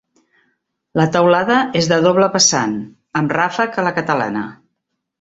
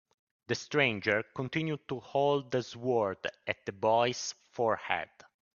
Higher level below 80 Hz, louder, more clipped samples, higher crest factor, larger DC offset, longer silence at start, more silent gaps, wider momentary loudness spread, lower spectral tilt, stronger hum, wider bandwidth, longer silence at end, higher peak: first, -56 dBFS vs -72 dBFS; first, -16 LUFS vs -32 LUFS; neither; about the same, 16 dB vs 20 dB; neither; first, 0.95 s vs 0.5 s; neither; first, 12 LU vs 9 LU; about the same, -3.5 dB/octave vs -4.5 dB/octave; neither; about the same, 8 kHz vs 7.4 kHz; about the same, 0.65 s vs 0.55 s; first, -2 dBFS vs -12 dBFS